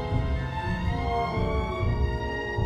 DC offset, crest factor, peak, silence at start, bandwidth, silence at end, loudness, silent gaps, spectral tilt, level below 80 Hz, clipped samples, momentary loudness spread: under 0.1%; 14 dB; -12 dBFS; 0 s; 9 kHz; 0 s; -28 LUFS; none; -7.5 dB/octave; -32 dBFS; under 0.1%; 3 LU